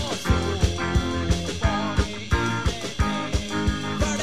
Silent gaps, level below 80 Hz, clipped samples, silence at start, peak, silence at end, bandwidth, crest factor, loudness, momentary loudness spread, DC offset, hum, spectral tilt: none; -30 dBFS; under 0.1%; 0 s; -6 dBFS; 0 s; 15 kHz; 18 dB; -25 LUFS; 3 LU; 1%; none; -5 dB/octave